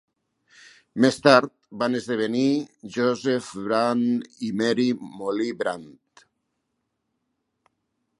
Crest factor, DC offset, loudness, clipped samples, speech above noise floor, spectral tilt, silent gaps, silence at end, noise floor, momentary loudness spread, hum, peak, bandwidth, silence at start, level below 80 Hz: 24 dB; under 0.1%; -23 LUFS; under 0.1%; 55 dB; -5.5 dB/octave; none; 2.3 s; -77 dBFS; 12 LU; none; 0 dBFS; 11.5 kHz; 0.95 s; -70 dBFS